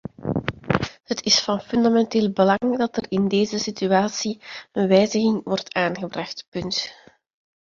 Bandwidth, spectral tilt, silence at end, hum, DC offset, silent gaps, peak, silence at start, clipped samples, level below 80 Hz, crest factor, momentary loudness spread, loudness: 7.6 kHz; -4.5 dB/octave; 0.7 s; none; under 0.1%; 6.48-6.52 s; -2 dBFS; 0.2 s; under 0.1%; -52 dBFS; 20 dB; 11 LU; -22 LUFS